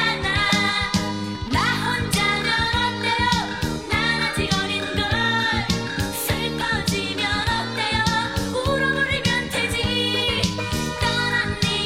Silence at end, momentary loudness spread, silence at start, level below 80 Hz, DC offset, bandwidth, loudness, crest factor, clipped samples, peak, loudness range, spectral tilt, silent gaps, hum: 0 s; 4 LU; 0 s; -38 dBFS; 0.3%; 16.5 kHz; -21 LUFS; 16 dB; under 0.1%; -6 dBFS; 1 LU; -4 dB/octave; none; none